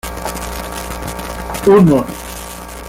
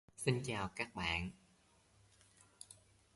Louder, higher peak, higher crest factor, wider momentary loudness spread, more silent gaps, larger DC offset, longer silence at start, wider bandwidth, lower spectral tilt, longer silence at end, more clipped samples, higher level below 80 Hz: first, -16 LUFS vs -40 LUFS; first, -2 dBFS vs -18 dBFS; second, 14 dB vs 26 dB; about the same, 18 LU vs 19 LU; neither; neither; second, 0.05 s vs 0.2 s; first, 17 kHz vs 11.5 kHz; first, -6 dB/octave vs -4.5 dB/octave; second, 0 s vs 0.45 s; neither; first, -32 dBFS vs -60 dBFS